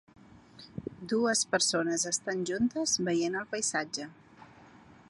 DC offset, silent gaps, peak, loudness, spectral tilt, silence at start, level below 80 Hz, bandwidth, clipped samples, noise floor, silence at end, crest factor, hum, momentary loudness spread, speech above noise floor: under 0.1%; none; -14 dBFS; -30 LUFS; -2.5 dB/octave; 0.55 s; -68 dBFS; 11.5 kHz; under 0.1%; -55 dBFS; 0.45 s; 18 dB; none; 16 LU; 25 dB